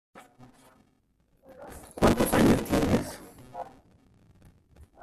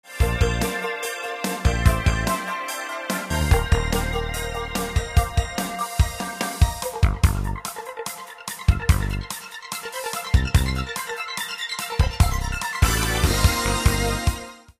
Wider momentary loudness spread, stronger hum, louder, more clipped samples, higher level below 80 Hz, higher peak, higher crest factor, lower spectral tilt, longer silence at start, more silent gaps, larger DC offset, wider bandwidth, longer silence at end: first, 23 LU vs 10 LU; neither; about the same, -24 LUFS vs -24 LUFS; neither; second, -44 dBFS vs -26 dBFS; second, -10 dBFS vs -2 dBFS; about the same, 20 dB vs 20 dB; about the same, -5.5 dB/octave vs -4.5 dB/octave; about the same, 0.15 s vs 0.05 s; neither; neither; about the same, 15 kHz vs 15.5 kHz; about the same, 0.2 s vs 0.1 s